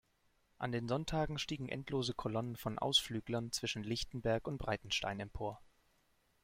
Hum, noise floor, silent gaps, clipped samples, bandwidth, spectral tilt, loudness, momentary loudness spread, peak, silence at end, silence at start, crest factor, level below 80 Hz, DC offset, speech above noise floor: none; -75 dBFS; none; under 0.1%; 16 kHz; -4.5 dB/octave; -38 LUFS; 10 LU; -18 dBFS; 0.8 s; 0.6 s; 22 dB; -58 dBFS; under 0.1%; 37 dB